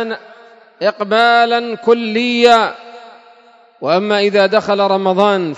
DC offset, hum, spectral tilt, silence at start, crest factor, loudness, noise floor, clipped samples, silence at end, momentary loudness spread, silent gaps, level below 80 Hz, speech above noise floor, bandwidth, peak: under 0.1%; none; -5 dB/octave; 0 s; 14 dB; -13 LUFS; -46 dBFS; 0.1%; 0 s; 10 LU; none; -64 dBFS; 33 dB; 11 kHz; 0 dBFS